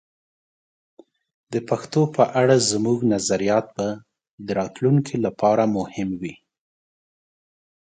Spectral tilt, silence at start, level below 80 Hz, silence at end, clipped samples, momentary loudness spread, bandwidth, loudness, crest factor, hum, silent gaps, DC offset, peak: -5.5 dB/octave; 1.5 s; -60 dBFS; 1.5 s; under 0.1%; 12 LU; 9.6 kHz; -21 LUFS; 20 dB; none; 4.31-4.38 s; under 0.1%; -2 dBFS